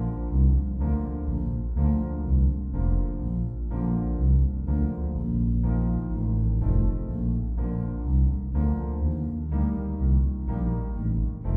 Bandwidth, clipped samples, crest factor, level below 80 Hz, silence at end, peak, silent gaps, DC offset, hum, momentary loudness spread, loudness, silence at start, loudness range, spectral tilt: 2 kHz; under 0.1%; 14 dB; -26 dBFS; 0 s; -10 dBFS; none; under 0.1%; none; 5 LU; -26 LUFS; 0 s; 1 LU; -13.5 dB/octave